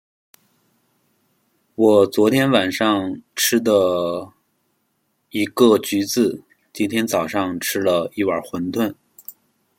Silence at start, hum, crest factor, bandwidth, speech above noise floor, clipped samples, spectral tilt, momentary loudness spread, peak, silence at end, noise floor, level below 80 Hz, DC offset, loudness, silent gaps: 1.8 s; none; 18 dB; 16.5 kHz; 51 dB; under 0.1%; -4 dB/octave; 15 LU; -2 dBFS; 0.45 s; -69 dBFS; -64 dBFS; under 0.1%; -19 LUFS; none